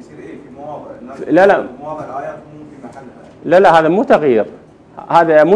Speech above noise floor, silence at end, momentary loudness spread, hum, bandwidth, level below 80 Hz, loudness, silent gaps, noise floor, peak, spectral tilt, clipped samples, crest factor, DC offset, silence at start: 24 dB; 0 s; 24 LU; none; 11 kHz; -52 dBFS; -12 LUFS; none; -36 dBFS; 0 dBFS; -6.5 dB/octave; 0.5%; 14 dB; under 0.1%; 0.15 s